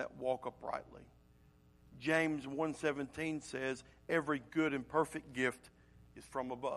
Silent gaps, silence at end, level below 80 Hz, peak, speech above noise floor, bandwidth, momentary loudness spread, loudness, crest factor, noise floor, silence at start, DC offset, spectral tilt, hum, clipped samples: none; 0 s; -68 dBFS; -18 dBFS; 27 dB; 12.5 kHz; 11 LU; -38 LUFS; 22 dB; -66 dBFS; 0 s; under 0.1%; -5.5 dB/octave; none; under 0.1%